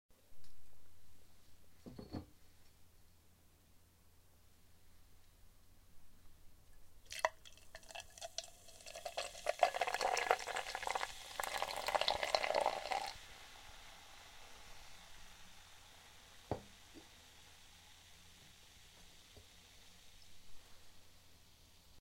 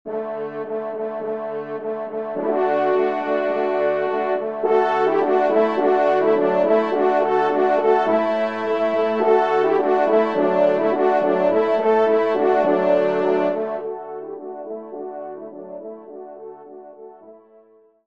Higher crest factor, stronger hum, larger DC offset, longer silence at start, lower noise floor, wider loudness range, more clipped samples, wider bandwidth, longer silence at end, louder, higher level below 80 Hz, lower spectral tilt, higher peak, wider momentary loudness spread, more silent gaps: first, 32 dB vs 16 dB; neither; second, under 0.1% vs 0.3%; about the same, 0.1 s vs 0.05 s; first, -67 dBFS vs -53 dBFS; first, 22 LU vs 13 LU; neither; first, 16.5 kHz vs 7 kHz; second, 0 s vs 0.7 s; second, -40 LUFS vs -19 LUFS; first, -66 dBFS vs -72 dBFS; second, -1.5 dB/octave vs -7 dB/octave; second, -14 dBFS vs -4 dBFS; first, 26 LU vs 15 LU; neither